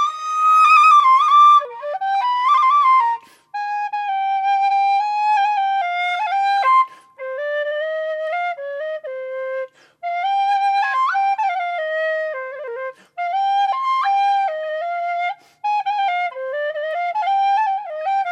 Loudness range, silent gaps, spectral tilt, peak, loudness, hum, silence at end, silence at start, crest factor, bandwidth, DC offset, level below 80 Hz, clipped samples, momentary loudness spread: 8 LU; none; 1 dB/octave; -2 dBFS; -18 LUFS; none; 0 s; 0 s; 16 dB; 11.5 kHz; under 0.1%; -88 dBFS; under 0.1%; 15 LU